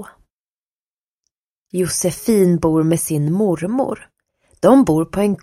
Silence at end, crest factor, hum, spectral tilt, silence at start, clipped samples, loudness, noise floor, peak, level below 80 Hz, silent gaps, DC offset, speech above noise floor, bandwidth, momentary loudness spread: 0.05 s; 18 dB; none; -6 dB/octave; 0 s; under 0.1%; -17 LUFS; under -90 dBFS; 0 dBFS; -48 dBFS; 0.32-1.23 s, 1.38-1.66 s; under 0.1%; over 74 dB; 16 kHz; 9 LU